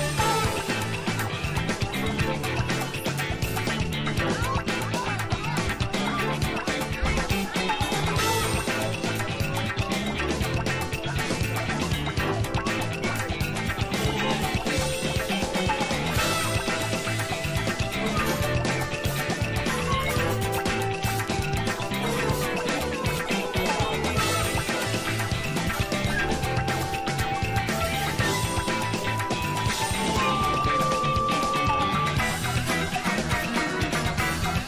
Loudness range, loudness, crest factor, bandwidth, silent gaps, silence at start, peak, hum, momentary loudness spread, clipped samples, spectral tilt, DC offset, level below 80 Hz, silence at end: 3 LU; -26 LUFS; 14 dB; 16 kHz; none; 0 s; -12 dBFS; none; 4 LU; under 0.1%; -4.5 dB/octave; under 0.1%; -38 dBFS; 0 s